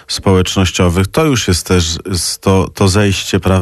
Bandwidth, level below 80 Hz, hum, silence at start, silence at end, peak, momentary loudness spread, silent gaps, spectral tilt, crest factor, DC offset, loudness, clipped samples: 13 kHz; -30 dBFS; none; 0.1 s; 0 s; -2 dBFS; 3 LU; none; -4.5 dB/octave; 10 dB; under 0.1%; -13 LUFS; under 0.1%